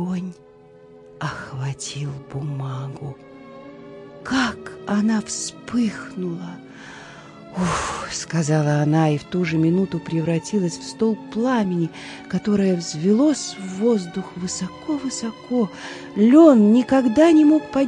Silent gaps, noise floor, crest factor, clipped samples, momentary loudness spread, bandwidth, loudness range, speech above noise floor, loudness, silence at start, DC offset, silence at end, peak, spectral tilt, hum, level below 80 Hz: none; -47 dBFS; 18 dB; under 0.1%; 21 LU; 11 kHz; 11 LU; 27 dB; -20 LUFS; 0 s; under 0.1%; 0 s; -2 dBFS; -6 dB/octave; none; -54 dBFS